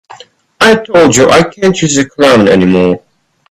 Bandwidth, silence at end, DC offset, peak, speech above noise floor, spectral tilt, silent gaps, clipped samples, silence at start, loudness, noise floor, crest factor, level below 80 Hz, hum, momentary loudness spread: 15 kHz; 0.5 s; under 0.1%; 0 dBFS; 28 dB; -4.5 dB/octave; none; 0.3%; 0.6 s; -8 LUFS; -36 dBFS; 8 dB; -42 dBFS; none; 6 LU